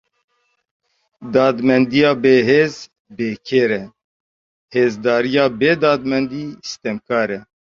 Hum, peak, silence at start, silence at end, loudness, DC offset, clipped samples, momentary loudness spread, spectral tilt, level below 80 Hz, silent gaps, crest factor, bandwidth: none; 0 dBFS; 1.2 s; 0.25 s; -17 LUFS; under 0.1%; under 0.1%; 13 LU; -6 dB/octave; -58 dBFS; 2.99-3.05 s, 4.04-4.68 s; 16 dB; 7.4 kHz